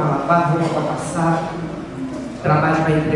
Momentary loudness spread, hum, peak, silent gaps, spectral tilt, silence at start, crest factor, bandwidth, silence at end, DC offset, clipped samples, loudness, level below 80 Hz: 12 LU; none; -2 dBFS; none; -7 dB/octave; 0 s; 16 dB; 11.5 kHz; 0 s; under 0.1%; under 0.1%; -19 LUFS; -46 dBFS